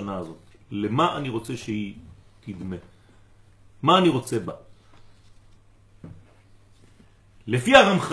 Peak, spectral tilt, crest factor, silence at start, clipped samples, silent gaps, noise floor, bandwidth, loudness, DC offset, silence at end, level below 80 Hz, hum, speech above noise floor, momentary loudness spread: 0 dBFS; -5 dB/octave; 26 dB; 0 s; under 0.1%; none; -54 dBFS; 11 kHz; -22 LUFS; under 0.1%; 0 s; -54 dBFS; none; 32 dB; 25 LU